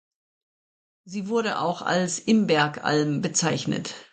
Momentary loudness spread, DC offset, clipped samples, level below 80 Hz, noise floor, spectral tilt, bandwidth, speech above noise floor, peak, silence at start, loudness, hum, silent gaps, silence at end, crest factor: 8 LU; under 0.1%; under 0.1%; -66 dBFS; under -90 dBFS; -4 dB/octave; 9.6 kHz; over 66 dB; -8 dBFS; 1.05 s; -24 LUFS; none; none; 0.1 s; 18 dB